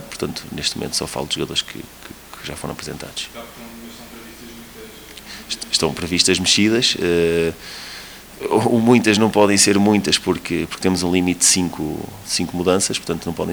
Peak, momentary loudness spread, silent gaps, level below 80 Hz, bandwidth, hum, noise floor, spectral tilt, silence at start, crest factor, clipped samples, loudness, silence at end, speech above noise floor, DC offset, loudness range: 0 dBFS; 23 LU; none; -48 dBFS; over 20 kHz; none; -38 dBFS; -3.5 dB/octave; 0 s; 20 dB; under 0.1%; -18 LUFS; 0 s; 19 dB; under 0.1%; 15 LU